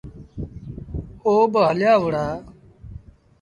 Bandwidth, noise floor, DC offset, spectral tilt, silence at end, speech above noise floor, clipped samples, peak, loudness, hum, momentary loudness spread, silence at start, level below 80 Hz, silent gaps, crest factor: 11 kHz; -42 dBFS; under 0.1%; -7.5 dB/octave; 0.45 s; 24 dB; under 0.1%; -6 dBFS; -19 LUFS; none; 23 LU; 0.05 s; -42 dBFS; none; 16 dB